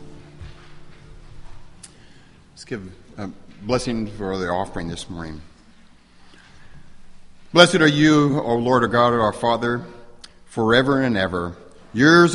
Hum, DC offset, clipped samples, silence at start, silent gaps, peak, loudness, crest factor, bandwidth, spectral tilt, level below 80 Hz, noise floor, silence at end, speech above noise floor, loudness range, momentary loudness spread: none; under 0.1%; under 0.1%; 0 s; none; 0 dBFS; -19 LUFS; 22 dB; 11.5 kHz; -5 dB/octave; -46 dBFS; -49 dBFS; 0 s; 30 dB; 15 LU; 21 LU